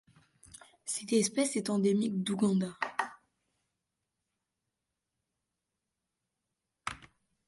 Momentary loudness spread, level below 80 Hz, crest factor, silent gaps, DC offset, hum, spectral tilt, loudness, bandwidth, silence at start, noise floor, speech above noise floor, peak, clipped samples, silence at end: 13 LU; -72 dBFS; 20 dB; none; under 0.1%; none; -4.5 dB/octave; -32 LUFS; 11.5 kHz; 0.85 s; -87 dBFS; 57 dB; -16 dBFS; under 0.1%; 0.45 s